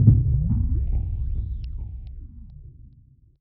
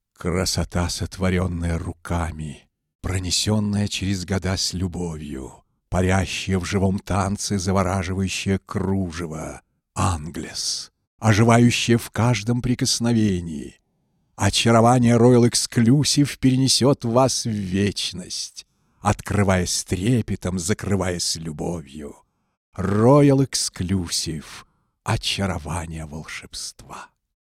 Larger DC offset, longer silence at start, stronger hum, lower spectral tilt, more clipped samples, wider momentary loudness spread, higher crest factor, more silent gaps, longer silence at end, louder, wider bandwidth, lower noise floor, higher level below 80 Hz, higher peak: neither; second, 0 s vs 0.2 s; neither; first, -14 dB/octave vs -5 dB/octave; neither; first, 23 LU vs 17 LU; about the same, 22 dB vs 20 dB; second, none vs 2.95-2.99 s, 11.07-11.18 s, 22.57-22.72 s; first, 0.55 s vs 0.35 s; second, -25 LUFS vs -21 LUFS; second, 1.2 kHz vs 15 kHz; second, -53 dBFS vs -68 dBFS; first, -28 dBFS vs -44 dBFS; about the same, -2 dBFS vs -2 dBFS